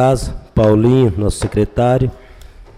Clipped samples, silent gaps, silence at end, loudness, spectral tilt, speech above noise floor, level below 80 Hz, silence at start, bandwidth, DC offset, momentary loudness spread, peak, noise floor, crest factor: under 0.1%; none; 0.15 s; -15 LUFS; -7.5 dB/octave; 24 dB; -28 dBFS; 0 s; 13.5 kHz; under 0.1%; 9 LU; -2 dBFS; -38 dBFS; 12 dB